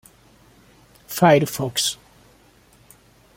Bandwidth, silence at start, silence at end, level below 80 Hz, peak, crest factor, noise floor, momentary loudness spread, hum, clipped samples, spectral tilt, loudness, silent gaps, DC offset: 16.5 kHz; 1.1 s; 1.4 s; -58 dBFS; -2 dBFS; 22 dB; -54 dBFS; 15 LU; none; under 0.1%; -4 dB/octave; -19 LUFS; none; under 0.1%